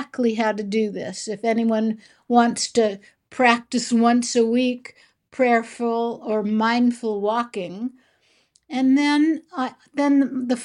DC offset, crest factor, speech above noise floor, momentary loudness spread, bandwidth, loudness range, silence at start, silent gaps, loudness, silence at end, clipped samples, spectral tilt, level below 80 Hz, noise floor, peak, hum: under 0.1%; 18 dB; 42 dB; 11 LU; 11 kHz; 3 LU; 0 s; none; -21 LUFS; 0 s; under 0.1%; -4 dB/octave; -70 dBFS; -62 dBFS; -2 dBFS; none